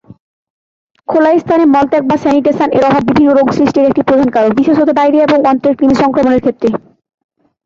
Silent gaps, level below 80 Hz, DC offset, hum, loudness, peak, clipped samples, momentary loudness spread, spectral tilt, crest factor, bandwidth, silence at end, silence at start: none; -44 dBFS; under 0.1%; none; -10 LUFS; 0 dBFS; under 0.1%; 3 LU; -7 dB/octave; 10 dB; 7.4 kHz; 0.85 s; 1.1 s